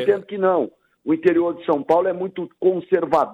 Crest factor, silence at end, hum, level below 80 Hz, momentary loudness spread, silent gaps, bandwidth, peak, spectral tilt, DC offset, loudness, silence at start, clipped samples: 16 dB; 0 s; none; -64 dBFS; 9 LU; none; 7.2 kHz; -4 dBFS; -8 dB/octave; under 0.1%; -21 LUFS; 0 s; under 0.1%